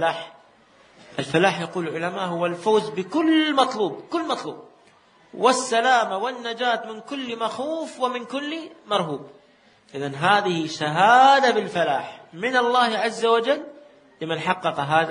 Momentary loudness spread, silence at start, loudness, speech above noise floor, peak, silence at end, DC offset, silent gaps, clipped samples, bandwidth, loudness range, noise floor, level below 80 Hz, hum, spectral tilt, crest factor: 14 LU; 0 s; -22 LUFS; 34 dB; -4 dBFS; 0 s; under 0.1%; none; under 0.1%; 10 kHz; 7 LU; -56 dBFS; -72 dBFS; none; -4 dB/octave; 20 dB